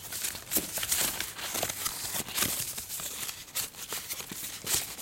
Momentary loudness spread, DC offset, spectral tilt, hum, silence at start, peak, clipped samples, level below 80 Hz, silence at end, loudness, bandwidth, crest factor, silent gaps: 8 LU; under 0.1%; -0.5 dB/octave; none; 0 s; -10 dBFS; under 0.1%; -58 dBFS; 0 s; -31 LUFS; 17 kHz; 24 dB; none